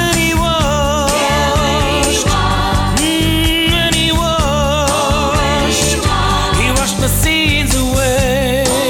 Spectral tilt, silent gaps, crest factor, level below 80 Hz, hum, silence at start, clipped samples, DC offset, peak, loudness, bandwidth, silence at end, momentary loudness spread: -3.5 dB/octave; none; 12 dB; -22 dBFS; none; 0 s; under 0.1%; under 0.1%; -2 dBFS; -13 LUFS; 19 kHz; 0 s; 2 LU